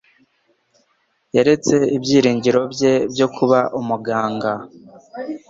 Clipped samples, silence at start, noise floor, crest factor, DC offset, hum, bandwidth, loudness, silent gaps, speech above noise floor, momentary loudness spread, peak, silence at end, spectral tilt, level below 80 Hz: under 0.1%; 1.35 s; -65 dBFS; 16 dB; under 0.1%; none; 7.8 kHz; -17 LUFS; none; 48 dB; 10 LU; -2 dBFS; 0.1 s; -5.5 dB/octave; -58 dBFS